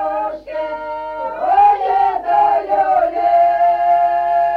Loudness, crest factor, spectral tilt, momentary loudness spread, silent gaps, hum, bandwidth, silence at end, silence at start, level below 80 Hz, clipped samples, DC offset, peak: -15 LUFS; 12 dB; -5.5 dB/octave; 12 LU; none; none; 5.2 kHz; 0 s; 0 s; -50 dBFS; under 0.1%; under 0.1%; -4 dBFS